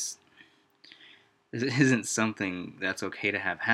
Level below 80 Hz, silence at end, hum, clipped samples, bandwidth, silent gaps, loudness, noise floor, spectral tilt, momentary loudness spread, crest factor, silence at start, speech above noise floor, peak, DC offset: -74 dBFS; 0 s; none; under 0.1%; 14.5 kHz; none; -29 LUFS; -60 dBFS; -4 dB/octave; 11 LU; 22 dB; 0 s; 32 dB; -8 dBFS; under 0.1%